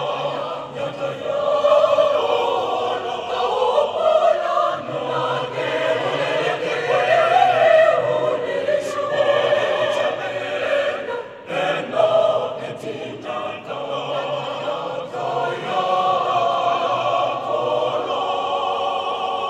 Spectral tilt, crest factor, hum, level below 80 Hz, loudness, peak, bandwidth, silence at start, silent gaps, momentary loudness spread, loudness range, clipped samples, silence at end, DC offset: -4 dB/octave; 18 dB; none; -66 dBFS; -20 LUFS; -2 dBFS; 10.5 kHz; 0 s; none; 11 LU; 5 LU; under 0.1%; 0 s; under 0.1%